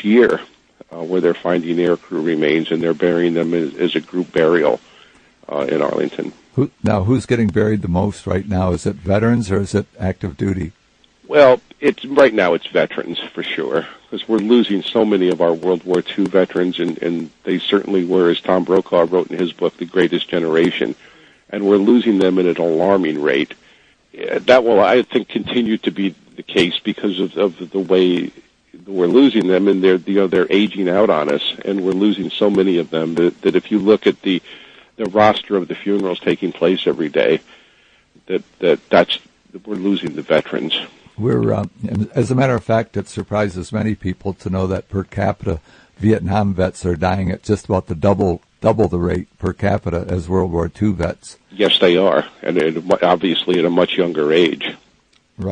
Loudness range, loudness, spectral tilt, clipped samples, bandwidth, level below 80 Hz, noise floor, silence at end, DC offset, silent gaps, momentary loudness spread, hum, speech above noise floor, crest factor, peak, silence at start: 4 LU; -17 LUFS; -6.5 dB/octave; under 0.1%; 9.8 kHz; -48 dBFS; -57 dBFS; 0 s; under 0.1%; none; 10 LU; none; 40 dB; 16 dB; 0 dBFS; 0 s